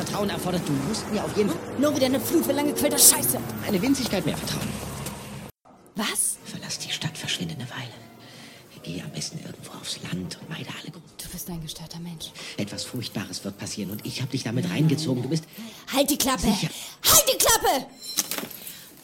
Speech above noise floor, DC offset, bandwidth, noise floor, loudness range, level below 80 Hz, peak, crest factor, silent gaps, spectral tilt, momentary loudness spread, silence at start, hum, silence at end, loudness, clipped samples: 25 dB; under 0.1%; 17 kHz; -49 dBFS; 13 LU; -50 dBFS; -2 dBFS; 24 dB; none; -3 dB/octave; 19 LU; 0 s; none; 0.05 s; -24 LUFS; under 0.1%